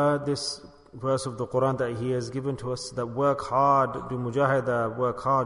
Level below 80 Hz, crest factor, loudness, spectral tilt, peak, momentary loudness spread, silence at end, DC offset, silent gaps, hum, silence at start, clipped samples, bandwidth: -56 dBFS; 16 dB; -27 LUFS; -6 dB/octave; -10 dBFS; 9 LU; 0 s; under 0.1%; none; none; 0 s; under 0.1%; 11 kHz